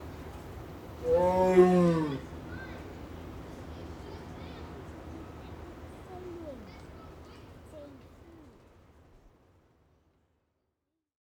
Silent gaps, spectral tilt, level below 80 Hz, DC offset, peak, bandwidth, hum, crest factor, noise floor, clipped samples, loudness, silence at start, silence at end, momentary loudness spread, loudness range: none; -8 dB/octave; -52 dBFS; under 0.1%; -10 dBFS; 17 kHz; none; 24 dB; -84 dBFS; under 0.1%; -27 LUFS; 0 s; 3.45 s; 26 LU; 24 LU